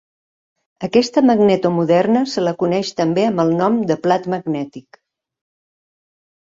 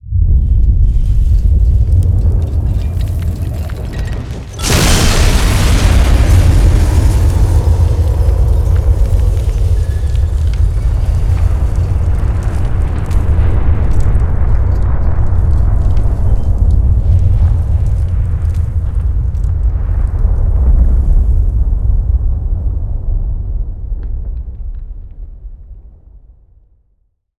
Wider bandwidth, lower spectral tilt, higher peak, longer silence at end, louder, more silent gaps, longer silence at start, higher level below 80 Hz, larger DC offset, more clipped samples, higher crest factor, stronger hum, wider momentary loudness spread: second, 7.8 kHz vs 16 kHz; about the same, -6.5 dB/octave vs -5.5 dB/octave; about the same, -2 dBFS vs 0 dBFS; first, 1.8 s vs 1.5 s; second, -17 LUFS vs -14 LUFS; neither; first, 0.8 s vs 0.05 s; second, -60 dBFS vs -12 dBFS; second, under 0.1% vs 1%; neither; first, 16 dB vs 10 dB; neither; about the same, 8 LU vs 10 LU